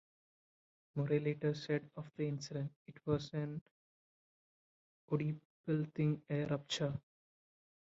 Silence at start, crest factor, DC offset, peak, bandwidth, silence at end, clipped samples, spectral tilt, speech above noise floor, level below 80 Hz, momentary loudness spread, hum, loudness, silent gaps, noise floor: 0.95 s; 20 dB; under 0.1%; -20 dBFS; 7.4 kHz; 0.95 s; under 0.1%; -6.5 dB/octave; over 52 dB; -74 dBFS; 11 LU; none; -40 LUFS; 2.76-2.86 s, 3.61-5.08 s, 5.45-5.64 s; under -90 dBFS